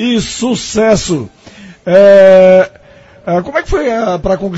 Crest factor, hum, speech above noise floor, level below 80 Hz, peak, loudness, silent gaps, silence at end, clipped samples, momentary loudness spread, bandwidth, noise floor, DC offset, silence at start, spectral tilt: 10 dB; none; 31 dB; -32 dBFS; 0 dBFS; -9 LUFS; none; 0 s; 2%; 15 LU; 8 kHz; -40 dBFS; under 0.1%; 0 s; -5 dB/octave